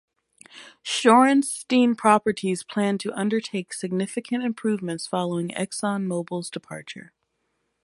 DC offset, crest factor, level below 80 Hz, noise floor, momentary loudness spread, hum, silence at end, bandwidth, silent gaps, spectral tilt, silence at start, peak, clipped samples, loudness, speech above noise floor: under 0.1%; 22 dB; -70 dBFS; -74 dBFS; 17 LU; none; 0.8 s; 11.5 kHz; none; -4.5 dB/octave; 0.55 s; -4 dBFS; under 0.1%; -23 LUFS; 51 dB